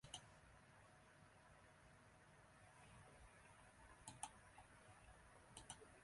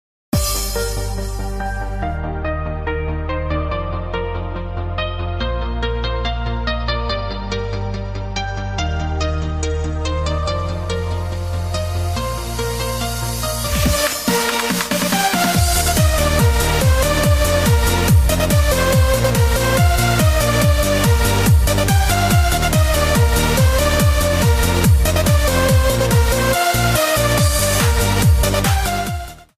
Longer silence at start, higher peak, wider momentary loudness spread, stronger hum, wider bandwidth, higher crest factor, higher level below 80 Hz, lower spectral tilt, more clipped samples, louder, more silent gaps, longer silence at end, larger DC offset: second, 0 s vs 0.35 s; second, -34 dBFS vs -4 dBFS; about the same, 11 LU vs 9 LU; neither; second, 11.5 kHz vs 15.5 kHz; first, 30 dB vs 12 dB; second, -76 dBFS vs -22 dBFS; second, -2.5 dB/octave vs -4.5 dB/octave; neither; second, -64 LUFS vs -17 LUFS; neither; second, 0 s vs 0.15 s; neither